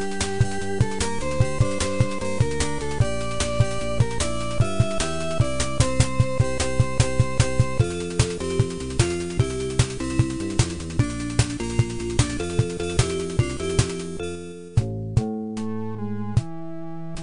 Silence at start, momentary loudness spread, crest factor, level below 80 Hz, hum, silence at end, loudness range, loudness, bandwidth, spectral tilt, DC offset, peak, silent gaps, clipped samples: 0 s; 7 LU; 20 dB; -34 dBFS; none; 0 s; 3 LU; -24 LUFS; 10.5 kHz; -5.5 dB/octave; 2%; -2 dBFS; none; under 0.1%